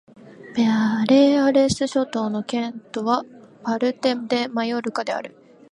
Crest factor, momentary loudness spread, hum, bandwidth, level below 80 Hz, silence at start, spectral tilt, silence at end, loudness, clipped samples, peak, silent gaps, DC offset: 16 dB; 12 LU; none; 11 kHz; -58 dBFS; 0.4 s; -5 dB/octave; 0.45 s; -21 LUFS; under 0.1%; -4 dBFS; none; under 0.1%